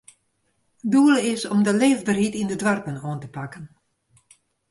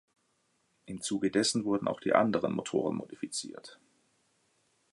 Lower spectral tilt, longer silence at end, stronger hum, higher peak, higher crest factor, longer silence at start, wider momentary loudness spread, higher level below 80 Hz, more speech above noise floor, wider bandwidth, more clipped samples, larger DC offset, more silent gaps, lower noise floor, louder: about the same, -5 dB/octave vs -4 dB/octave; second, 1.05 s vs 1.2 s; neither; about the same, -8 dBFS vs -8 dBFS; second, 16 dB vs 24 dB; about the same, 0.85 s vs 0.9 s; first, 17 LU vs 12 LU; first, -62 dBFS vs -70 dBFS; first, 49 dB vs 43 dB; about the same, 11.5 kHz vs 11.5 kHz; neither; neither; neither; second, -70 dBFS vs -75 dBFS; first, -21 LUFS vs -31 LUFS